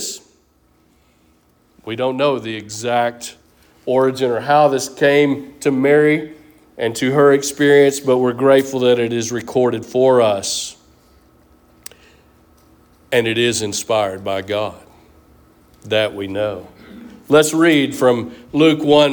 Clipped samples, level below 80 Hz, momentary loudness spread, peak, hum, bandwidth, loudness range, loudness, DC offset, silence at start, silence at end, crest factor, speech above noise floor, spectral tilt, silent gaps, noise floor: under 0.1%; -56 dBFS; 11 LU; -2 dBFS; none; over 20 kHz; 8 LU; -16 LUFS; under 0.1%; 0 s; 0 s; 16 dB; 41 dB; -4.5 dB/octave; none; -57 dBFS